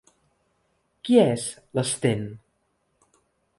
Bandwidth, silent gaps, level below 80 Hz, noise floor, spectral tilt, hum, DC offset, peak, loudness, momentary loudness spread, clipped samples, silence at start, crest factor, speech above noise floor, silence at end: 11.5 kHz; none; -64 dBFS; -72 dBFS; -5 dB/octave; none; under 0.1%; -4 dBFS; -23 LUFS; 15 LU; under 0.1%; 1.05 s; 22 dB; 49 dB; 1.2 s